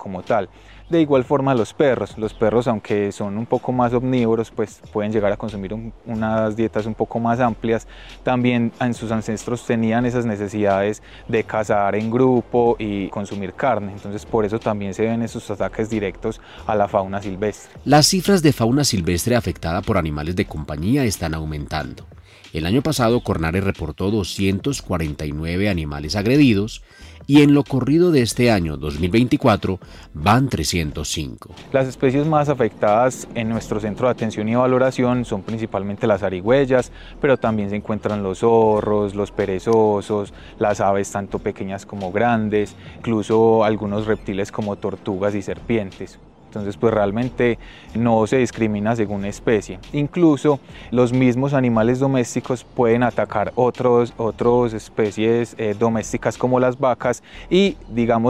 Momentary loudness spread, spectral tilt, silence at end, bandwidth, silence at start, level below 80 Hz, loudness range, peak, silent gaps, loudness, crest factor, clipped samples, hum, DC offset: 10 LU; -6 dB/octave; 0 s; 16 kHz; 0 s; -42 dBFS; 4 LU; -2 dBFS; none; -20 LUFS; 16 dB; under 0.1%; none; 0.2%